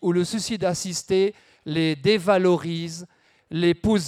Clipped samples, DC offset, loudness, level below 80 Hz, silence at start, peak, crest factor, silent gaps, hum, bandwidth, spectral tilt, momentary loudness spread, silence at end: under 0.1%; under 0.1%; -23 LUFS; -50 dBFS; 0 s; -6 dBFS; 16 dB; none; none; 14.5 kHz; -5 dB/octave; 12 LU; 0 s